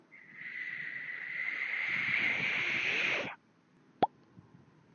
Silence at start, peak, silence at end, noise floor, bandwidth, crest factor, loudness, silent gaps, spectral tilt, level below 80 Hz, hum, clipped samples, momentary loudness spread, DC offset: 0.1 s; -12 dBFS; 0.55 s; -66 dBFS; 6.8 kHz; 24 dB; -33 LUFS; none; 0 dB/octave; -80 dBFS; none; under 0.1%; 13 LU; under 0.1%